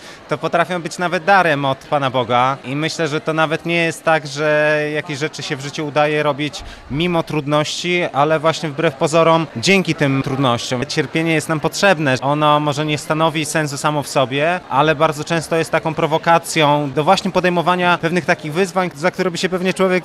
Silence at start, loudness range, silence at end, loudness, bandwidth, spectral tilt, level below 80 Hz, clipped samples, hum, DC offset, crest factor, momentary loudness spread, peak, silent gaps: 0 s; 2 LU; 0 s; -17 LUFS; 15 kHz; -5 dB/octave; -50 dBFS; under 0.1%; none; under 0.1%; 16 dB; 6 LU; -2 dBFS; none